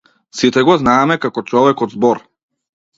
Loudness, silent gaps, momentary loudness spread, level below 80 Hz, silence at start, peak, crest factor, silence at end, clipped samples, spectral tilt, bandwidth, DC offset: -14 LUFS; none; 7 LU; -50 dBFS; 0.35 s; 0 dBFS; 14 dB; 0.8 s; under 0.1%; -5.5 dB/octave; 7.8 kHz; under 0.1%